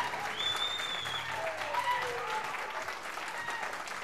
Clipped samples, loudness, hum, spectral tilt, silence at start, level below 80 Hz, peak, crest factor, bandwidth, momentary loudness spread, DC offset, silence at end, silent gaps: under 0.1%; -34 LUFS; none; -1 dB/octave; 0 s; -70 dBFS; -20 dBFS; 16 dB; 15.5 kHz; 6 LU; 0.2%; 0 s; none